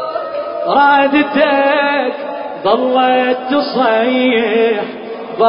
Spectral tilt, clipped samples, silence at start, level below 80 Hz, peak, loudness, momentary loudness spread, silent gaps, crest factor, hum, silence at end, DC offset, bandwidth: -9.5 dB/octave; under 0.1%; 0 s; -58 dBFS; 0 dBFS; -13 LUFS; 11 LU; none; 12 dB; none; 0 s; under 0.1%; 5.4 kHz